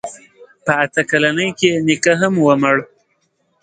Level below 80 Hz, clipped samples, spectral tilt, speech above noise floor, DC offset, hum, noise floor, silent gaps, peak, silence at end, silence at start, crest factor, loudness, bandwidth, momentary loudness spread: -60 dBFS; under 0.1%; -4.5 dB/octave; 49 dB; under 0.1%; none; -64 dBFS; none; 0 dBFS; 0.8 s; 0.05 s; 16 dB; -15 LUFS; 9.4 kHz; 6 LU